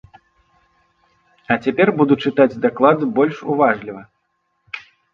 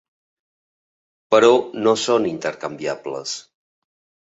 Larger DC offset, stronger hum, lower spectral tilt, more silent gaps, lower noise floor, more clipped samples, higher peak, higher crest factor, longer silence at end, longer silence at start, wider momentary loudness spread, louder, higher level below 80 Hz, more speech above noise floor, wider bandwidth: neither; neither; first, -8 dB/octave vs -3.5 dB/octave; neither; second, -69 dBFS vs under -90 dBFS; neither; about the same, 0 dBFS vs -2 dBFS; about the same, 18 dB vs 20 dB; second, 0.35 s vs 0.9 s; first, 1.5 s vs 1.3 s; first, 18 LU vs 14 LU; about the same, -17 LUFS vs -19 LUFS; first, -60 dBFS vs -66 dBFS; second, 53 dB vs over 71 dB; second, 6.6 kHz vs 8 kHz